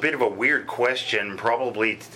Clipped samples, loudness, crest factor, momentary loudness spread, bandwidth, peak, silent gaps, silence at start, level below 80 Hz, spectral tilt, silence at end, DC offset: under 0.1%; -23 LUFS; 18 dB; 3 LU; 16.5 kHz; -6 dBFS; none; 0 s; -70 dBFS; -4 dB/octave; 0 s; under 0.1%